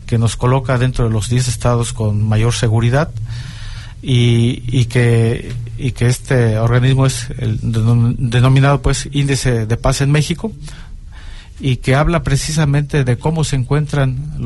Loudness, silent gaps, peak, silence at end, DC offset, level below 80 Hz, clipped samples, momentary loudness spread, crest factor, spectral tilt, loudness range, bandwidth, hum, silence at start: -15 LUFS; none; -2 dBFS; 0 s; under 0.1%; -28 dBFS; under 0.1%; 11 LU; 12 dB; -6 dB/octave; 3 LU; 12 kHz; none; 0 s